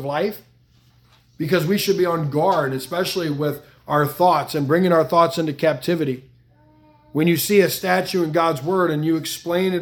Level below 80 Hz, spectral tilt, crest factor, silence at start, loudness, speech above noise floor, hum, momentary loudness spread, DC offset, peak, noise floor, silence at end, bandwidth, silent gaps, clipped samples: -60 dBFS; -5.5 dB/octave; 18 dB; 0 s; -20 LUFS; 36 dB; none; 8 LU; under 0.1%; -2 dBFS; -55 dBFS; 0 s; 18 kHz; none; under 0.1%